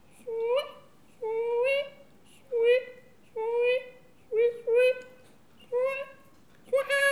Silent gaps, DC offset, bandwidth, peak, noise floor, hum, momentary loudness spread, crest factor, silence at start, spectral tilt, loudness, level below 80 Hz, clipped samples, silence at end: none; 0.1%; 13.5 kHz; -12 dBFS; -59 dBFS; none; 16 LU; 16 dB; 0.25 s; -1.5 dB/octave; -28 LUFS; -76 dBFS; under 0.1%; 0 s